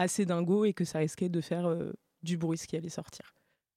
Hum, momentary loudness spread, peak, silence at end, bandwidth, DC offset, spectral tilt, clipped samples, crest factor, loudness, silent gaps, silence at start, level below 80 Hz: none; 14 LU; -14 dBFS; 0.6 s; 14.5 kHz; under 0.1%; -6 dB/octave; under 0.1%; 18 dB; -32 LUFS; none; 0 s; -70 dBFS